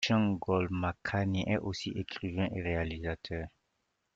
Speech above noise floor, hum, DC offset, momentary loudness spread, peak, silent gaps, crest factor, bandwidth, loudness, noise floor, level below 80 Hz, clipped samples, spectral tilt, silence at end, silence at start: 48 dB; none; under 0.1%; 9 LU; -16 dBFS; none; 18 dB; 7.8 kHz; -34 LUFS; -80 dBFS; -54 dBFS; under 0.1%; -6.5 dB/octave; 0.7 s; 0 s